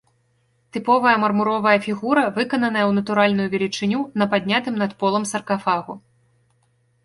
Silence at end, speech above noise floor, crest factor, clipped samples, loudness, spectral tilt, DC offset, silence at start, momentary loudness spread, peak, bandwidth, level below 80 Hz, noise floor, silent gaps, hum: 1.05 s; 45 dB; 18 dB; under 0.1%; -20 LUFS; -5 dB/octave; under 0.1%; 0.75 s; 7 LU; -4 dBFS; 11.5 kHz; -62 dBFS; -64 dBFS; none; none